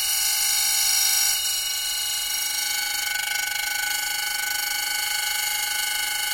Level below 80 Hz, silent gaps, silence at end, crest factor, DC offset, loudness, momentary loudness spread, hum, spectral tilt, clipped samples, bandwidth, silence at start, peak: -56 dBFS; none; 0 s; 16 dB; under 0.1%; -21 LUFS; 6 LU; none; 3.5 dB/octave; under 0.1%; 17 kHz; 0 s; -8 dBFS